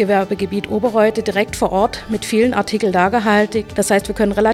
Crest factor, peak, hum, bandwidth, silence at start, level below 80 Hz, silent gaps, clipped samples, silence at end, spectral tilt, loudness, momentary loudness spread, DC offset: 16 dB; 0 dBFS; none; 15.5 kHz; 0 s; -40 dBFS; none; under 0.1%; 0 s; -5 dB/octave; -17 LUFS; 4 LU; under 0.1%